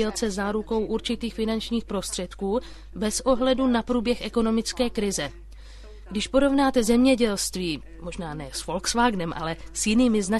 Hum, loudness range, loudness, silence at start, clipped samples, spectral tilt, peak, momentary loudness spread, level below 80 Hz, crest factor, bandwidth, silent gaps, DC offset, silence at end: none; 2 LU; -25 LUFS; 0 s; under 0.1%; -4 dB/octave; -8 dBFS; 12 LU; -42 dBFS; 16 dB; 12.5 kHz; none; under 0.1%; 0 s